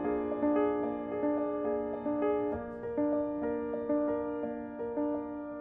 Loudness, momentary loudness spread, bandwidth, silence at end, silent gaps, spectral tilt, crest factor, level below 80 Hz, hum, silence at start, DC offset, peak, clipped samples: -33 LUFS; 7 LU; 3.8 kHz; 0 s; none; -10.5 dB/octave; 14 dB; -60 dBFS; none; 0 s; under 0.1%; -20 dBFS; under 0.1%